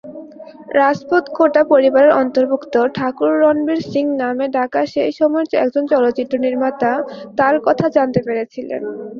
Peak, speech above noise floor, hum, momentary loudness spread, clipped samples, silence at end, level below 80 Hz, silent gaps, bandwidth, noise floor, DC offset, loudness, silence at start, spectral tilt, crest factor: -2 dBFS; 21 dB; none; 10 LU; under 0.1%; 0 s; -58 dBFS; none; 7 kHz; -36 dBFS; under 0.1%; -16 LUFS; 0.05 s; -7 dB/octave; 14 dB